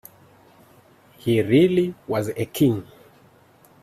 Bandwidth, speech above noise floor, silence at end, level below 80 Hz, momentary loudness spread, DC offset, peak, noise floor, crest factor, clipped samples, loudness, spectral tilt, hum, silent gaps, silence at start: 15 kHz; 34 dB; 1 s; -58 dBFS; 11 LU; under 0.1%; -6 dBFS; -54 dBFS; 18 dB; under 0.1%; -21 LUFS; -7 dB/octave; none; none; 1.25 s